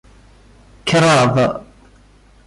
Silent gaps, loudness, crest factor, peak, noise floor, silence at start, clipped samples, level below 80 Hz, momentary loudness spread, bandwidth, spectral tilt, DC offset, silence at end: none; -15 LUFS; 14 dB; -4 dBFS; -48 dBFS; 0.85 s; under 0.1%; -46 dBFS; 14 LU; 11.5 kHz; -5 dB/octave; under 0.1%; 0.85 s